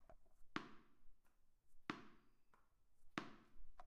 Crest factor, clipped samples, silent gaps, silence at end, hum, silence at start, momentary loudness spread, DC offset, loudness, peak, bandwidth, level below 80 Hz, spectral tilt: 32 dB; under 0.1%; none; 0 s; none; 0 s; 13 LU; under 0.1%; -55 LUFS; -24 dBFS; 11.5 kHz; -70 dBFS; -4.5 dB/octave